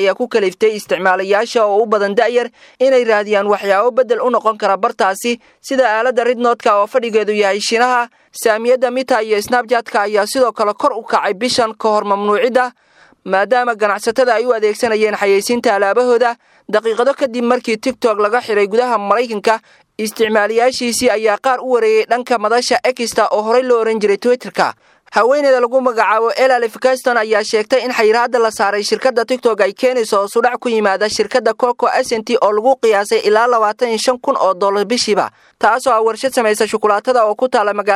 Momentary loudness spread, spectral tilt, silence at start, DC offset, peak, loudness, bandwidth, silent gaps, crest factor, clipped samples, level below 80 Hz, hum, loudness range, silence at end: 4 LU; -3 dB/octave; 0 s; under 0.1%; 0 dBFS; -14 LUFS; 15 kHz; none; 14 dB; under 0.1%; -62 dBFS; none; 1 LU; 0 s